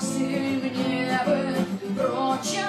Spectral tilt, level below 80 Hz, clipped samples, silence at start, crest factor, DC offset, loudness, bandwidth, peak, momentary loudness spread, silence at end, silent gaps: -4.5 dB/octave; -66 dBFS; under 0.1%; 0 s; 14 dB; under 0.1%; -25 LUFS; 14 kHz; -12 dBFS; 3 LU; 0 s; none